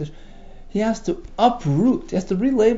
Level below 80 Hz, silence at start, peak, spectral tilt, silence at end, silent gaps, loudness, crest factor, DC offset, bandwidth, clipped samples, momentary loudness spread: -40 dBFS; 0 s; -4 dBFS; -7 dB/octave; 0 s; none; -21 LUFS; 18 dB; under 0.1%; 7.8 kHz; under 0.1%; 10 LU